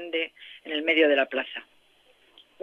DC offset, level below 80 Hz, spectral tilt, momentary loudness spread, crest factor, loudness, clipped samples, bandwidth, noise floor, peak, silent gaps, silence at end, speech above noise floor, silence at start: under 0.1%; -82 dBFS; -3.5 dB/octave; 18 LU; 18 dB; -25 LUFS; under 0.1%; 5.6 kHz; -61 dBFS; -10 dBFS; none; 1 s; 35 dB; 0 s